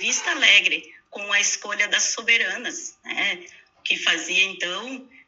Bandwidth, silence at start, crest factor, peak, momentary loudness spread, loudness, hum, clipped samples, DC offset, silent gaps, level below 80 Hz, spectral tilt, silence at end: 8.2 kHz; 0 s; 20 dB; -2 dBFS; 18 LU; -20 LUFS; none; under 0.1%; under 0.1%; none; -78 dBFS; 1.5 dB/octave; 0.25 s